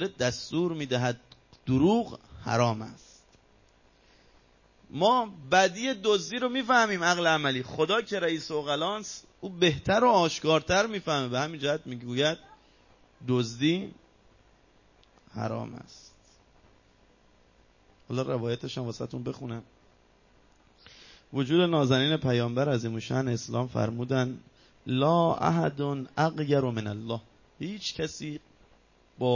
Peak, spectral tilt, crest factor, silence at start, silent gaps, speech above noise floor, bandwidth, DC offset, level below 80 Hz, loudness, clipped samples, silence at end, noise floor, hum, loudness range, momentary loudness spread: -10 dBFS; -5 dB/octave; 20 dB; 0 s; none; 34 dB; 7.4 kHz; under 0.1%; -60 dBFS; -28 LUFS; under 0.1%; 0 s; -62 dBFS; none; 11 LU; 15 LU